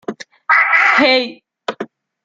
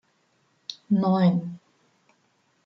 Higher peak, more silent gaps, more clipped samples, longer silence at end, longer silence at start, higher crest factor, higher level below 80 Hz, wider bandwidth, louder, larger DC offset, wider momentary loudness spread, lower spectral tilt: first, -2 dBFS vs -10 dBFS; neither; neither; second, 0.4 s vs 1.1 s; second, 0.1 s vs 0.7 s; about the same, 14 dB vs 16 dB; first, -66 dBFS vs -74 dBFS; first, 7.8 kHz vs 6.2 kHz; first, -11 LUFS vs -23 LUFS; neither; about the same, 20 LU vs 20 LU; second, -3 dB/octave vs -8.5 dB/octave